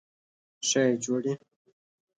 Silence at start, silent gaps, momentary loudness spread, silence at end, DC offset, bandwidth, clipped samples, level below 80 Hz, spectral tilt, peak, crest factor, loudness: 0.6 s; none; 9 LU; 0.8 s; under 0.1%; 9.6 kHz; under 0.1%; -80 dBFS; -3.5 dB/octave; -12 dBFS; 18 dB; -27 LUFS